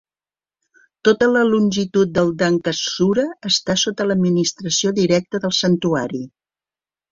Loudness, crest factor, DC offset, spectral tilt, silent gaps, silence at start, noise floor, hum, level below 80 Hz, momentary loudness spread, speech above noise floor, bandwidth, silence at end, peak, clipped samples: -18 LUFS; 18 dB; under 0.1%; -4.5 dB/octave; none; 1.05 s; under -90 dBFS; none; -54 dBFS; 5 LU; over 72 dB; 7.6 kHz; 0.85 s; -2 dBFS; under 0.1%